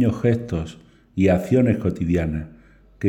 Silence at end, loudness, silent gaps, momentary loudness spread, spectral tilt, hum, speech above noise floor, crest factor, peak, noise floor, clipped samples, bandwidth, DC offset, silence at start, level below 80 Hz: 0 s; -21 LUFS; none; 15 LU; -8.5 dB/octave; none; 27 dB; 14 dB; -6 dBFS; -47 dBFS; under 0.1%; 16.5 kHz; under 0.1%; 0 s; -40 dBFS